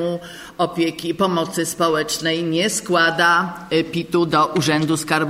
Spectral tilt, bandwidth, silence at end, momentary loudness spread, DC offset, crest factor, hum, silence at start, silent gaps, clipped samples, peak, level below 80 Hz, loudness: -4 dB/octave; 16 kHz; 0 s; 7 LU; under 0.1%; 16 dB; none; 0 s; none; under 0.1%; -2 dBFS; -56 dBFS; -19 LUFS